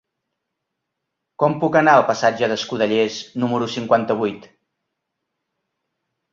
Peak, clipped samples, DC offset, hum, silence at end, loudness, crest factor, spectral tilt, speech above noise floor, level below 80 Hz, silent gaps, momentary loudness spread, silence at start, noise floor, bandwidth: -2 dBFS; under 0.1%; under 0.1%; none; 1.95 s; -19 LUFS; 20 dB; -5 dB/octave; 61 dB; -64 dBFS; none; 9 LU; 1.4 s; -79 dBFS; 7.6 kHz